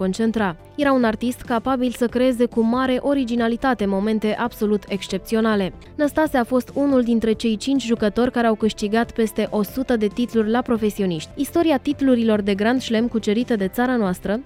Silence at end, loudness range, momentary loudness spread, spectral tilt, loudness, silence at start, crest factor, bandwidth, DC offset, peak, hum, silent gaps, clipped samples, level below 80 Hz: 0 s; 1 LU; 5 LU; -6 dB/octave; -21 LUFS; 0 s; 14 dB; 16 kHz; under 0.1%; -6 dBFS; none; none; under 0.1%; -46 dBFS